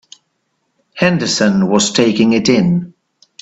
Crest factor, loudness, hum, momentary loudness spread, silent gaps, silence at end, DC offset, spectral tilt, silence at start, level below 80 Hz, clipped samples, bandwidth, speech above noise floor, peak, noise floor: 14 dB; -13 LUFS; none; 4 LU; none; 0.5 s; under 0.1%; -4.5 dB/octave; 0.95 s; -52 dBFS; under 0.1%; 8.4 kHz; 55 dB; 0 dBFS; -67 dBFS